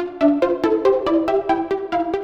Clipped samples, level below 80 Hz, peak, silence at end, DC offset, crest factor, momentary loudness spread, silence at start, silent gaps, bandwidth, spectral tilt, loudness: under 0.1%; -50 dBFS; -4 dBFS; 0 s; under 0.1%; 14 dB; 5 LU; 0 s; none; 7.6 kHz; -6.5 dB/octave; -19 LUFS